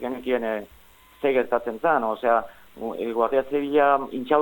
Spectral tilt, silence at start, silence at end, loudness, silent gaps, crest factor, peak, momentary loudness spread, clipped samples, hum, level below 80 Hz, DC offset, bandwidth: -6.5 dB/octave; 0 s; 0 s; -24 LUFS; none; 18 dB; -6 dBFS; 11 LU; under 0.1%; none; -58 dBFS; under 0.1%; 17.5 kHz